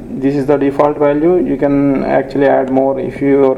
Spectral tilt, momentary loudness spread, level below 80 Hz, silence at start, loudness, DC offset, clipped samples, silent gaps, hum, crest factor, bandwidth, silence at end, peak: -9 dB/octave; 4 LU; -38 dBFS; 0 s; -13 LUFS; under 0.1%; under 0.1%; none; none; 12 dB; 5.8 kHz; 0 s; 0 dBFS